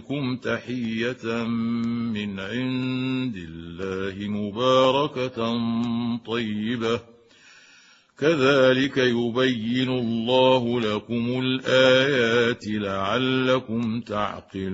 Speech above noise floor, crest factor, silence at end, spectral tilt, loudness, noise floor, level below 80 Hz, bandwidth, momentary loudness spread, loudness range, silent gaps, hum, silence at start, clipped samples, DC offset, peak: 31 dB; 18 dB; 0 s; -6 dB/octave; -23 LUFS; -54 dBFS; -60 dBFS; 8 kHz; 11 LU; 6 LU; none; none; 0 s; under 0.1%; under 0.1%; -4 dBFS